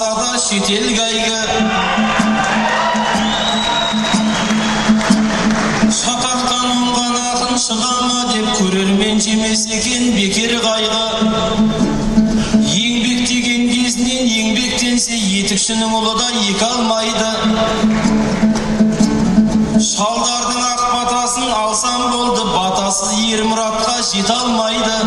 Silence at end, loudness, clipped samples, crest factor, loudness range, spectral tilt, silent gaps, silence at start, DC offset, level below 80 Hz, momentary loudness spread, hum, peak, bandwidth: 0 s; -14 LUFS; under 0.1%; 14 dB; 1 LU; -3 dB/octave; none; 0 s; under 0.1%; -36 dBFS; 2 LU; none; 0 dBFS; 12 kHz